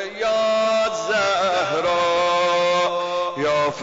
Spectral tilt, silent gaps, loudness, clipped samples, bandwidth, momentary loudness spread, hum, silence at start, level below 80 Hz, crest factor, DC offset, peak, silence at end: -3 dB/octave; none; -20 LUFS; under 0.1%; 7.8 kHz; 4 LU; none; 0 s; -58 dBFS; 8 dB; under 0.1%; -12 dBFS; 0 s